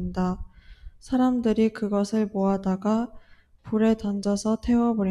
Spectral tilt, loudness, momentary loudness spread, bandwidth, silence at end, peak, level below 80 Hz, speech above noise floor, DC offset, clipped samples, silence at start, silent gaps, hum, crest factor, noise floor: -7 dB/octave; -25 LUFS; 6 LU; 11.5 kHz; 0 s; -10 dBFS; -46 dBFS; 22 dB; under 0.1%; under 0.1%; 0 s; none; none; 14 dB; -45 dBFS